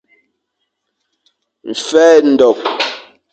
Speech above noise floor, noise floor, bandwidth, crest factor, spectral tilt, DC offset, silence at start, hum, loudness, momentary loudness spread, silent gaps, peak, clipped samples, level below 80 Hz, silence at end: 62 dB; -72 dBFS; 8.8 kHz; 14 dB; -3 dB/octave; under 0.1%; 1.65 s; none; -12 LUFS; 19 LU; none; 0 dBFS; under 0.1%; -62 dBFS; 0.3 s